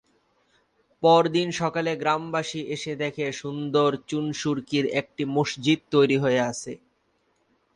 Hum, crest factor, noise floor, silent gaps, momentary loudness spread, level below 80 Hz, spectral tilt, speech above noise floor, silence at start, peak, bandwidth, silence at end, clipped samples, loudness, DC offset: none; 18 dB; -69 dBFS; none; 11 LU; -66 dBFS; -5 dB/octave; 45 dB; 1 s; -6 dBFS; 11 kHz; 1 s; under 0.1%; -24 LUFS; under 0.1%